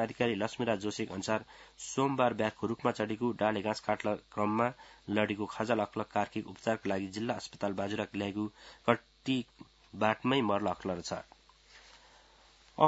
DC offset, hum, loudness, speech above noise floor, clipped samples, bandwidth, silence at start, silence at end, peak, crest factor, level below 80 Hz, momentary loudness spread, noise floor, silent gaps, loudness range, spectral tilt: under 0.1%; none; -34 LUFS; 28 dB; under 0.1%; 8 kHz; 0 s; 0 s; -8 dBFS; 26 dB; -68 dBFS; 8 LU; -61 dBFS; none; 3 LU; -4 dB/octave